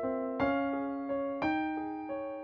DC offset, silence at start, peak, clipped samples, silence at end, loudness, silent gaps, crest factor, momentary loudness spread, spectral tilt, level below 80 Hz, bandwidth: under 0.1%; 0 s; -18 dBFS; under 0.1%; 0 s; -34 LUFS; none; 16 dB; 7 LU; -8 dB/octave; -64 dBFS; 6 kHz